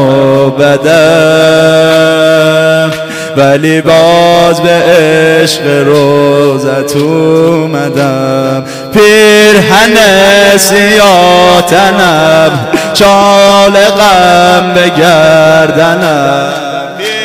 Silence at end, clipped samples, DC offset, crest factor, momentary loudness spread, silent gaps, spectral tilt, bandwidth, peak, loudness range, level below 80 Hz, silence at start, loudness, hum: 0 s; 3%; under 0.1%; 6 dB; 7 LU; none; -4.5 dB/octave; 16.5 kHz; 0 dBFS; 3 LU; -38 dBFS; 0 s; -5 LUFS; none